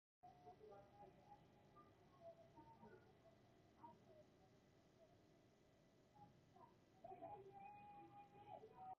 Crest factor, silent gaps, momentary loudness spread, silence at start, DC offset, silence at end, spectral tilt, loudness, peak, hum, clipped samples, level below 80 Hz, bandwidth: 18 dB; none; 8 LU; 0.25 s; under 0.1%; 0 s; -5.5 dB/octave; -64 LUFS; -46 dBFS; none; under 0.1%; -86 dBFS; 7 kHz